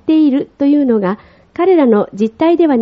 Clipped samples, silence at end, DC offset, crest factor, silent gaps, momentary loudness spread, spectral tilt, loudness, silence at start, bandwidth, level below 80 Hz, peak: under 0.1%; 0 s; under 0.1%; 12 dB; none; 9 LU; -6.5 dB/octave; -13 LUFS; 0.05 s; 6.4 kHz; -54 dBFS; 0 dBFS